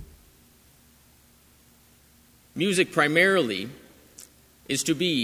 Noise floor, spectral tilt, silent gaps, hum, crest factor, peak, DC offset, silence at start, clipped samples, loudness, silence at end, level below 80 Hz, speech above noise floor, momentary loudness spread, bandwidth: -57 dBFS; -3.5 dB/octave; none; none; 22 dB; -6 dBFS; under 0.1%; 0 s; under 0.1%; -23 LUFS; 0 s; -60 dBFS; 34 dB; 20 LU; 16 kHz